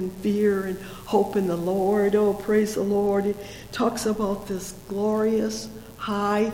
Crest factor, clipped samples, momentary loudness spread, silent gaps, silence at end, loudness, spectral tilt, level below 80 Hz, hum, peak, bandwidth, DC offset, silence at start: 14 dB; under 0.1%; 11 LU; none; 0 s; -24 LUFS; -6 dB/octave; -50 dBFS; none; -10 dBFS; 17 kHz; under 0.1%; 0 s